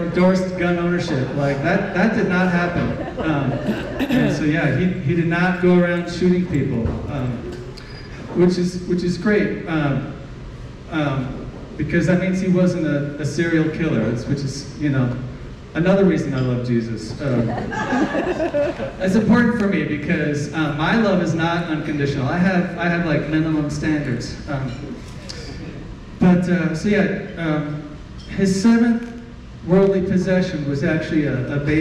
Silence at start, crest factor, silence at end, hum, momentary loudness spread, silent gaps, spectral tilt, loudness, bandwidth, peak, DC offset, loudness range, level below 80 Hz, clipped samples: 0 s; 12 dB; 0 s; none; 15 LU; none; -7 dB/octave; -20 LUFS; 10 kHz; -8 dBFS; under 0.1%; 3 LU; -40 dBFS; under 0.1%